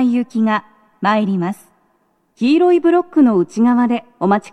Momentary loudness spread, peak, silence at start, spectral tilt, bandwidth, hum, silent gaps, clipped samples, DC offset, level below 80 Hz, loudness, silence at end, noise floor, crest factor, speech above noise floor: 9 LU; -2 dBFS; 0 s; -7.5 dB/octave; 11.5 kHz; none; none; under 0.1%; under 0.1%; -70 dBFS; -16 LUFS; 0 s; -61 dBFS; 14 dB; 47 dB